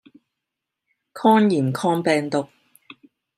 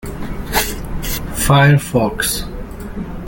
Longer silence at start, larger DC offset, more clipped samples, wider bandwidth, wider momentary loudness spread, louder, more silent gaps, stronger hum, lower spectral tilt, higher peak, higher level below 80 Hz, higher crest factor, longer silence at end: first, 1.15 s vs 0 s; neither; neither; second, 14.5 kHz vs 17 kHz; second, 10 LU vs 17 LU; second, -20 LUFS vs -16 LUFS; neither; neither; first, -6.5 dB/octave vs -4.5 dB/octave; second, -4 dBFS vs 0 dBFS; second, -72 dBFS vs -28 dBFS; about the same, 20 dB vs 18 dB; first, 0.9 s vs 0 s